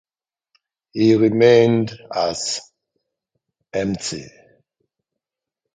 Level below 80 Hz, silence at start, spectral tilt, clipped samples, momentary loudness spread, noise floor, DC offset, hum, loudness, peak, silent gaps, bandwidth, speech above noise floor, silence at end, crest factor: -56 dBFS; 0.95 s; -5 dB/octave; under 0.1%; 15 LU; -85 dBFS; under 0.1%; none; -18 LUFS; -2 dBFS; none; 9.4 kHz; 68 dB; 1.45 s; 20 dB